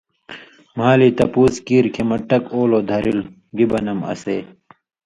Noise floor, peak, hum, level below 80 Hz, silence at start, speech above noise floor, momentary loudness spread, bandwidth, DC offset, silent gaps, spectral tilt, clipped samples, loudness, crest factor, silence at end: -40 dBFS; 0 dBFS; none; -48 dBFS; 0.3 s; 23 dB; 18 LU; 11 kHz; under 0.1%; none; -7 dB/octave; under 0.1%; -18 LUFS; 18 dB; 0.6 s